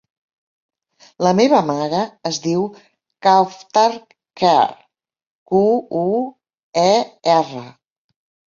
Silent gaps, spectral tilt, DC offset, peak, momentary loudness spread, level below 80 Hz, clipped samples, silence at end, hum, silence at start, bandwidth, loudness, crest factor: 5.27-5.46 s, 6.63-6.73 s; -5 dB/octave; under 0.1%; -2 dBFS; 9 LU; -64 dBFS; under 0.1%; 0.85 s; none; 1.2 s; 7.6 kHz; -17 LUFS; 16 dB